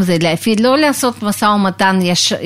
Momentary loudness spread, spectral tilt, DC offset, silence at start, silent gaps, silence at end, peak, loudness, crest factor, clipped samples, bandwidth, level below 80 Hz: 4 LU; -4 dB/octave; under 0.1%; 0 s; none; 0 s; 0 dBFS; -13 LUFS; 14 dB; under 0.1%; 16 kHz; -52 dBFS